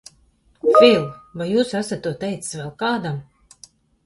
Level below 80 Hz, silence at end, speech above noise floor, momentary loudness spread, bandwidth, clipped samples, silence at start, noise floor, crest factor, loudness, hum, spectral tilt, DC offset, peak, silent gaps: -58 dBFS; 0.85 s; 38 dB; 17 LU; 11.5 kHz; under 0.1%; 0.65 s; -58 dBFS; 20 dB; -19 LUFS; none; -5 dB/octave; under 0.1%; 0 dBFS; none